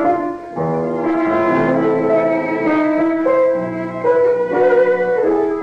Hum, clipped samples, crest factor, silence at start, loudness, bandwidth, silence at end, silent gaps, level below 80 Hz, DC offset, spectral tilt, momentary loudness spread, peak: none; under 0.1%; 12 dB; 0 s; -16 LUFS; 6.8 kHz; 0 s; none; -54 dBFS; under 0.1%; -8.5 dB/octave; 6 LU; -4 dBFS